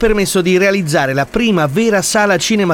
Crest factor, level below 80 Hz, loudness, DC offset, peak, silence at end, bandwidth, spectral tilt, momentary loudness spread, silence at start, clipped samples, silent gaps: 12 dB; -34 dBFS; -13 LUFS; under 0.1%; -2 dBFS; 0 s; 19 kHz; -4.5 dB/octave; 3 LU; 0 s; under 0.1%; none